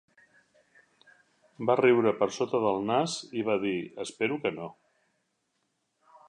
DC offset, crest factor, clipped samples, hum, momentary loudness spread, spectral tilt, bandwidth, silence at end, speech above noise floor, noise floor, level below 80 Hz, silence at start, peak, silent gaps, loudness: under 0.1%; 20 dB; under 0.1%; none; 11 LU; -5 dB/octave; 10 kHz; 1.55 s; 50 dB; -77 dBFS; -74 dBFS; 1.6 s; -10 dBFS; none; -28 LUFS